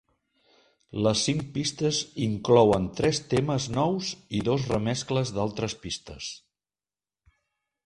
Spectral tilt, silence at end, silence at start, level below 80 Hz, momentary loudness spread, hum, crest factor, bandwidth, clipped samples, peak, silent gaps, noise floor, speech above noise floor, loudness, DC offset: -5 dB/octave; 1.5 s; 0.95 s; -52 dBFS; 13 LU; none; 22 dB; 11.5 kHz; under 0.1%; -6 dBFS; none; under -90 dBFS; over 64 dB; -26 LUFS; under 0.1%